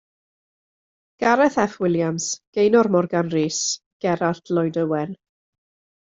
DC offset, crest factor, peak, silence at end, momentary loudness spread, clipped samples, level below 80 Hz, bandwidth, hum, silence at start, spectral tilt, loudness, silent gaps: under 0.1%; 18 dB; -4 dBFS; 0.85 s; 8 LU; under 0.1%; -62 dBFS; 8 kHz; none; 1.2 s; -4.5 dB/octave; -21 LUFS; 2.47-2.53 s, 3.86-4.00 s